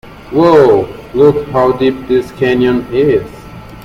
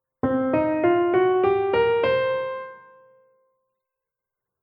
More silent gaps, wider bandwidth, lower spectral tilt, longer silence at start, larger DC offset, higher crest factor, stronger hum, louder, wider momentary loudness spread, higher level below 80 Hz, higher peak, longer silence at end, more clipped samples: neither; first, 14.5 kHz vs 5.2 kHz; second, -7.5 dB/octave vs -9.5 dB/octave; second, 0.05 s vs 0.25 s; neither; about the same, 12 dB vs 14 dB; neither; first, -11 LUFS vs -21 LUFS; about the same, 10 LU vs 10 LU; first, -38 dBFS vs -58 dBFS; first, 0 dBFS vs -8 dBFS; second, 0 s vs 1.85 s; first, 0.1% vs under 0.1%